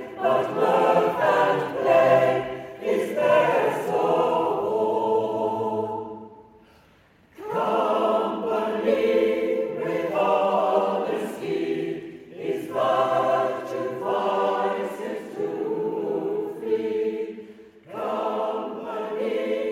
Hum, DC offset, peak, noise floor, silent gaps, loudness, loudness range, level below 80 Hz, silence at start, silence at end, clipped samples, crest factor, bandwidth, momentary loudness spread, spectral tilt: none; under 0.1%; -6 dBFS; -57 dBFS; none; -24 LUFS; 7 LU; -68 dBFS; 0 s; 0 s; under 0.1%; 18 dB; 16 kHz; 11 LU; -6 dB/octave